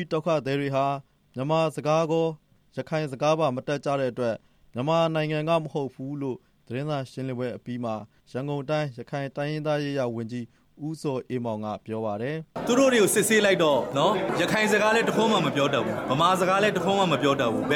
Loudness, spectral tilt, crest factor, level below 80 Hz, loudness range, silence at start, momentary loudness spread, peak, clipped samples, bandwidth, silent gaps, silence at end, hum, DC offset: -25 LUFS; -5 dB/octave; 16 dB; -62 dBFS; 9 LU; 0 s; 13 LU; -10 dBFS; under 0.1%; 18 kHz; none; 0 s; none; under 0.1%